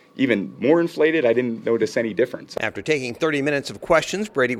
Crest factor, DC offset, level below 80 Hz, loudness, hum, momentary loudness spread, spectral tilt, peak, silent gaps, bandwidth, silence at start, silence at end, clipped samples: 18 dB; under 0.1%; -56 dBFS; -21 LUFS; none; 6 LU; -5 dB/octave; -4 dBFS; none; 14.5 kHz; 0.15 s; 0 s; under 0.1%